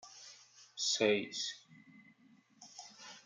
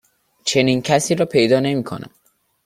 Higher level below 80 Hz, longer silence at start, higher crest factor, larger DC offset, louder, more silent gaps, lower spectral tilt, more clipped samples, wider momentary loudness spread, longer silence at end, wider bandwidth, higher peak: second, -90 dBFS vs -56 dBFS; second, 0.05 s vs 0.45 s; about the same, 22 dB vs 18 dB; neither; second, -34 LUFS vs -17 LUFS; neither; second, -2 dB/octave vs -4.5 dB/octave; neither; first, 23 LU vs 11 LU; second, 0.1 s vs 0.6 s; second, 9.6 kHz vs 15.5 kHz; second, -18 dBFS vs -2 dBFS